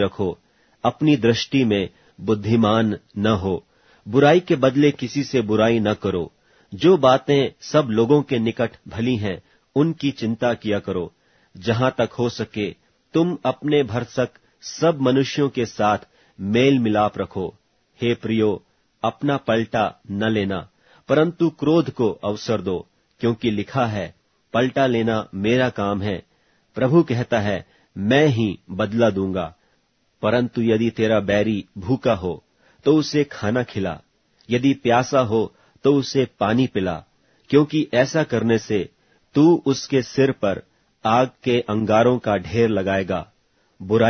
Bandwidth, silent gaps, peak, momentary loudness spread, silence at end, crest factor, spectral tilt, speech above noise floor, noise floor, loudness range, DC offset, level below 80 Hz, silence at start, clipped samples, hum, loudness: 6.6 kHz; none; -2 dBFS; 11 LU; 0 s; 18 dB; -6.5 dB/octave; 46 dB; -65 dBFS; 4 LU; under 0.1%; -54 dBFS; 0 s; under 0.1%; none; -21 LUFS